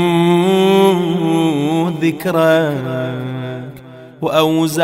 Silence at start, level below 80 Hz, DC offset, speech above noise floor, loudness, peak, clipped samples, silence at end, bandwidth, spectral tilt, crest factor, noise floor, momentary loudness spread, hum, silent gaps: 0 s; -56 dBFS; under 0.1%; 22 dB; -15 LUFS; 0 dBFS; under 0.1%; 0 s; 16 kHz; -6 dB/octave; 14 dB; -36 dBFS; 12 LU; none; none